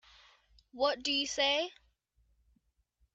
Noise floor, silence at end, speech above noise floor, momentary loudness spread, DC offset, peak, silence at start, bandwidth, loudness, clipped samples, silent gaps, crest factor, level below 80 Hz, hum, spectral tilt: -75 dBFS; 1.45 s; 42 dB; 4 LU; under 0.1%; -18 dBFS; 0.75 s; 8.6 kHz; -31 LUFS; under 0.1%; none; 18 dB; -68 dBFS; none; -0.5 dB/octave